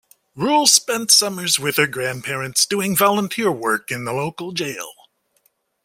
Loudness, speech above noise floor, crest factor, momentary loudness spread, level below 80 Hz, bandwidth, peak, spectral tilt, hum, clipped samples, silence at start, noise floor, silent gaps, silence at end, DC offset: -18 LUFS; 45 dB; 20 dB; 12 LU; -62 dBFS; 16.5 kHz; 0 dBFS; -2 dB/octave; none; under 0.1%; 0.35 s; -64 dBFS; none; 0.95 s; under 0.1%